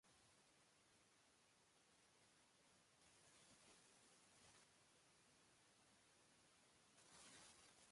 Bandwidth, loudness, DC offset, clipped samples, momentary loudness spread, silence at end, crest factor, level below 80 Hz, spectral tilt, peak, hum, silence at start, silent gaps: 11.5 kHz; -67 LUFS; under 0.1%; under 0.1%; 5 LU; 0 s; 20 dB; under -90 dBFS; -1.5 dB/octave; -54 dBFS; none; 0.05 s; none